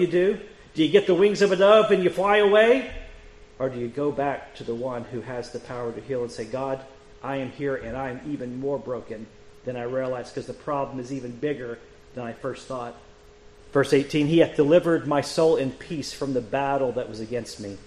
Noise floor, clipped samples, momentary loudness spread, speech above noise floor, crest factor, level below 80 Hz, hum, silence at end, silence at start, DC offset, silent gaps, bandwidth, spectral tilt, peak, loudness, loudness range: -50 dBFS; under 0.1%; 16 LU; 26 dB; 20 dB; -52 dBFS; none; 0.05 s; 0 s; under 0.1%; none; 11.5 kHz; -6 dB/octave; -4 dBFS; -24 LUFS; 12 LU